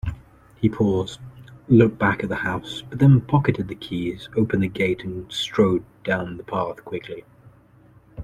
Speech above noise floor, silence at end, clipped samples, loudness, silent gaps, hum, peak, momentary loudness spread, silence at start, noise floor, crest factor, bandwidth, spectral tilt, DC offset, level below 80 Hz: 31 dB; 0 s; under 0.1%; -22 LUFS; none; none; -2 dBFS; 16 LU; 0.05 s; -52 dBFS; 20 dB; 10 kHz; -7.5 dB/octave; under 0.1%; -46 dBFS